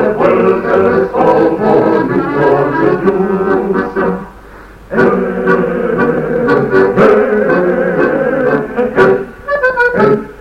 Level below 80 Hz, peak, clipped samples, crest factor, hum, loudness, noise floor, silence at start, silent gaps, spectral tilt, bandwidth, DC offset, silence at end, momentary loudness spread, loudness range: -40 dBFS; 0 dBFS; under 0.1%; 12 dB; none; -11 LUFS; -34 dBFS; 0 s; none; -8.5 dB/octave; 8 kHz; under 0.1%; 0 s; 5 LU; 3 LU